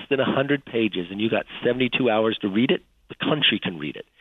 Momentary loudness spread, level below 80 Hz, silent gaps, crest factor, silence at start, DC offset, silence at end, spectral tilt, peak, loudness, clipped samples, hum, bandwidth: 8 LU; -60 dBFS; none; 16 dB; 0 s; under 0.1%; 0.2 s; -8 dB/octave; -8 dBFS; -23 LUFS; under 0.1%; none; 4.4 kHz